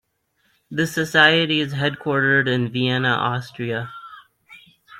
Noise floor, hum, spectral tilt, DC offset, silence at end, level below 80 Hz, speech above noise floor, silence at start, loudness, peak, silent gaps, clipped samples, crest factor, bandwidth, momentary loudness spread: -67 dBFS; none; -5 dB/octave; under 0.1%; 0 s; -62 dBFS; 47 dB; 0.7 s; -19 LUFS; -2 dBFS; none; under 0.1%; 20 dB; 16 kHz; 14 LU